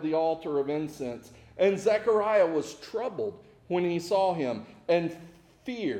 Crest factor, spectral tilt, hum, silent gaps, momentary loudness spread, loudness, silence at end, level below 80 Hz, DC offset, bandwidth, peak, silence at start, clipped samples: 16 dB; -6 dB/octave; none; none; 13 LU; -28 LUFS; 0 s; -66 dBFS; under 0.1%; 15 kHz; -14 dBFS; 0 s; under 0.1%